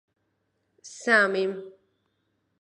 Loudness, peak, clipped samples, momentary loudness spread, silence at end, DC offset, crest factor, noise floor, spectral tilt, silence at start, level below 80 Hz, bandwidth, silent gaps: -23 LUFS; -8 dBFS; under 0.1%; 20 LU; 0.9 s; under 0.1%; 22 dB; -75 dBFS; -3.5 dB/octave; 0.85 s; -84 dBFS; 11 kHz; none